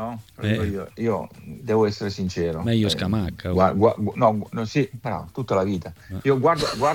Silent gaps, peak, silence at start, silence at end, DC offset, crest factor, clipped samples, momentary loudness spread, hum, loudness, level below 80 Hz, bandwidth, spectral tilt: none; -4 dBFS; 0 s; 0 s; under 0.1%; 18 dB; under 0.1%; 10 LU; none; -23 LUFS; -48 dBFS; 17.5 kHz; -6.5 dB/octave